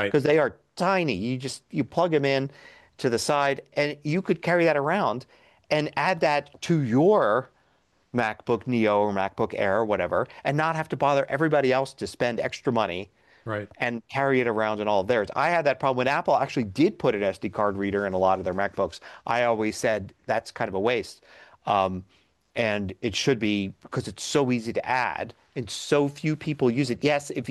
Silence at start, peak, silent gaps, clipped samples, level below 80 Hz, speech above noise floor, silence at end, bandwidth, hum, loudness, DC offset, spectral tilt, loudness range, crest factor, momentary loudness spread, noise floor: 0 s; -10 dBFS; none; under 0.1%; -62 dBFS; 42 dB; 0 s; 12.5 kHz; none; -25 LUFS; under 0.1%; -5.5 dB/octave; 3 LU; 16 dB; 9 LU; -66 dBFS